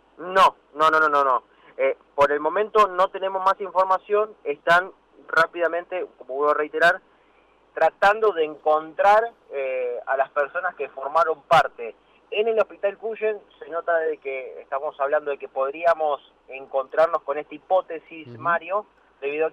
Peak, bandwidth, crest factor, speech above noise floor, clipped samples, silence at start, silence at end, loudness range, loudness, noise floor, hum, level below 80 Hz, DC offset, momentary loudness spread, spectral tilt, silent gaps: -10 dBFS; 15 kHz; 14 dB; 36 dB; under 0.1%; 0.2 s; 0 s; 5 LU; -23 LUFS; -58 dBFS; none; -62 dBFS; under 0.1%; 13 LU; -4 dB/octave; none